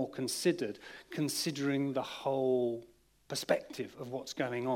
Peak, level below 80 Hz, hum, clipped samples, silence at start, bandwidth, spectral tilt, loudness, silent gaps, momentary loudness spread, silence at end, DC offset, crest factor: -14 dBFS; -74 dBFS; none; under 0.1%; 0 s; 16 kHz; -4.5 dB/octave; -35 LUFS; none; 11 LU; 0 s; under 0.1%; 20 dB